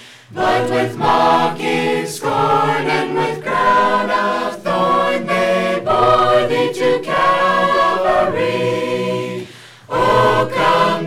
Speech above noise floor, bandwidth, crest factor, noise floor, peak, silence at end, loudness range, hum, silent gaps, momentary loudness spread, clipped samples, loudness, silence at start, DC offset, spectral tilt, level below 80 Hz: 21 dB; 15.5 kHz; 14 dB; -36 dBFS; 0 dBFS; 0 s; 2 LU; none; none; 7 LU; under 0.1%; -15 LUFS; 0 s; under 0.1%; -5 dB/octave; -48 dBFS